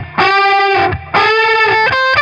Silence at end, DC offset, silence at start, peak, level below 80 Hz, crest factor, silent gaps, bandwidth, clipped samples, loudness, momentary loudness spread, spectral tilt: 0 s; under 0.1%; 0 s; 0 dBFS; -40 dBFS; 12 dB; none; 8.4 kHz; under 0.1%; -10 LUFS; 3 LU; -4.5 dB/octave